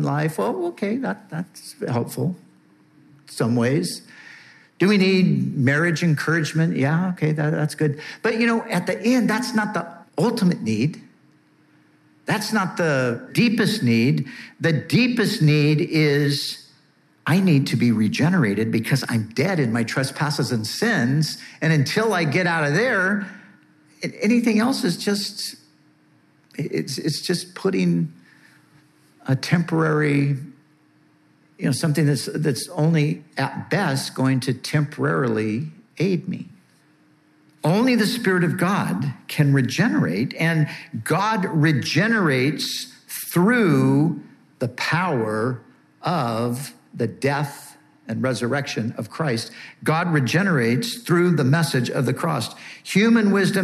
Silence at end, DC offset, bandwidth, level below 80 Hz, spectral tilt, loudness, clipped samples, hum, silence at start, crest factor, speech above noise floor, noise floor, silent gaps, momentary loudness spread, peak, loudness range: 0 s; under 0.1%; 14.5 kHz; -72 dBFS; -6 dB/octave; -21 LUFS; under 0.1%; none; 0 s; 16 dB; 38 dB; -58 dBFS; none; 11 LU; -4 dBFS; 6 LU